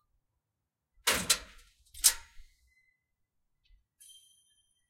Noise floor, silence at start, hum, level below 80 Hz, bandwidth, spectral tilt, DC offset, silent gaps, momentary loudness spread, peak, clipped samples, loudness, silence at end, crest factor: -87 dBFS; 1.05 s; none; -58 dBFS; 16.5 kHz; 0.5 dB/octave; under 0.1%; none; 7 LU; -4 dBFS; under 0.1%; -28 LUFS; 2.45 s; 34 dB